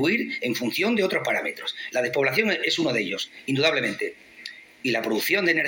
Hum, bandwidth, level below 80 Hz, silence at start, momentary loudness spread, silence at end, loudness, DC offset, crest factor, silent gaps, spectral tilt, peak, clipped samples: none; 17 kHz; -70 dBFS; 0 s; 10 LU; 0 s; -24 LUFS; under 0.1%; 18 dB; none; -4 dB/octave; -8 dBFS; under 0.1%